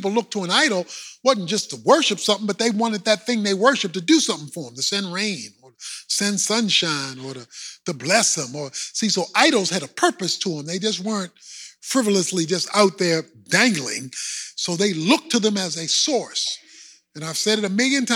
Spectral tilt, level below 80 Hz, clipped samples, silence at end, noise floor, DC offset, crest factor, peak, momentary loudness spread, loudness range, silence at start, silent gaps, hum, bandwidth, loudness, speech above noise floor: -2.5 dB/octave; -78 dBFS; under 0.1%; 0 s; -48 dBFS; under 0.1%; 20 dB; -2 dBFS; 14 LU; 2 LU; 0 s; none; none; 16.5 kHz; -20 LUFS; 26 dB